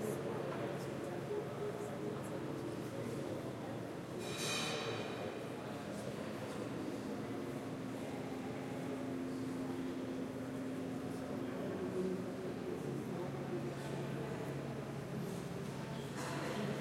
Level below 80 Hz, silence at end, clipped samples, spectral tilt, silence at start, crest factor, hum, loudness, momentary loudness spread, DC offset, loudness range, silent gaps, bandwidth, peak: -70 dBFS; 0 s; under 0.1%; -5.5 dB/octave; 0 s; 16 dB; none; -43 LUFS; 4 LU; under 0.1%; 2 LU; none; 16 kHz; -26 dBFS